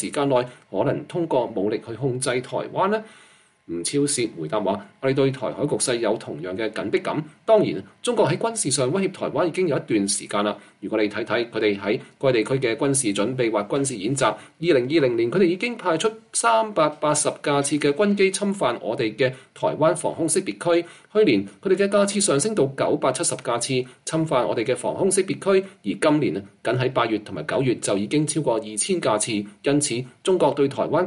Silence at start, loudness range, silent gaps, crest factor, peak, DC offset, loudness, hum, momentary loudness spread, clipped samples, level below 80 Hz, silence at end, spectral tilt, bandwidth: 0 s; 3 LU; none; 16 dB; -6 dBFS; under 0.1%; -22 LUFS; none; 7 LU; under 0.1%; -64 dBFS; 0 s; -4.5 dB/octave; 11.5 kHz